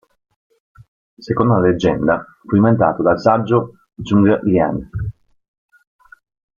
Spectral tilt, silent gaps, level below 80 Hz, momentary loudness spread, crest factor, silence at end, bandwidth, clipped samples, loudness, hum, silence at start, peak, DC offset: -8.5 dB/octave; none; -44 dBFS; 13 LU; 16 dB; 1.45 s; 7.2 kHz; under 0.1%; -16 LUFS; none; 1.2 s; -2 dBFS; under 0.1%